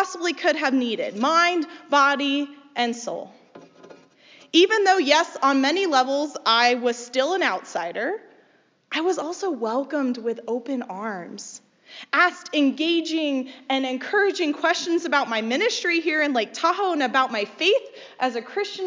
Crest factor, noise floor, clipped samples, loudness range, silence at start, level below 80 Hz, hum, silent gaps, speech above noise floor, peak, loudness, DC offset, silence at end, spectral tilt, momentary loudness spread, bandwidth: 20 dB; -61 dBFS; under 0.1%; 7 LU; 0 s; -86 dBFS; none; none; 38 dB; -4 dBFS; -22 LUFS; under 0.1%; 0 s; -2 dB/octave; 11 LU; 7.6 kHz